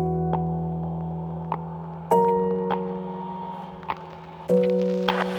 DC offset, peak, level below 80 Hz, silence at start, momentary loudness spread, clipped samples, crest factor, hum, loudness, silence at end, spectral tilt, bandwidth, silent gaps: under 0.1%; -4 dBFS; -50 dBFS; 0 s; 14 LU; under 0.1%; 20 dB; none; -26 LUFS; 0 s; -8 dB/octave; 19 kHz; none